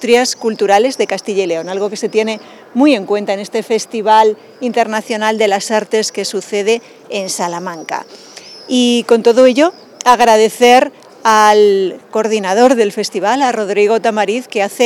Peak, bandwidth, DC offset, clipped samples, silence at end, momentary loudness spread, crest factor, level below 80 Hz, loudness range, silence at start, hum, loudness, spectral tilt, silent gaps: 0 dBFS; 17 kHz; under 0.1%; under 0.1%; 0 s; 12 LU; 12 dB; -62 dBFS; 6 LU; 0 s; none; -13 LUFS; -3 dB/octave; none